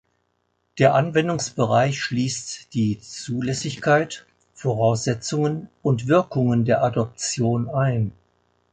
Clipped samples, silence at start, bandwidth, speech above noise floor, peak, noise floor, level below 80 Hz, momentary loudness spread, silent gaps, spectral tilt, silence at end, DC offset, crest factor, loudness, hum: under 0.1%; 0.75 s; 9.4 kHz; 49 dB; -4 dBFS; -71 dBFS; -56 dBFS; 10 LU; none; -5.5 dB/octave; 0.6 s; under 0.1%; 18 dB; -22 LUFS; none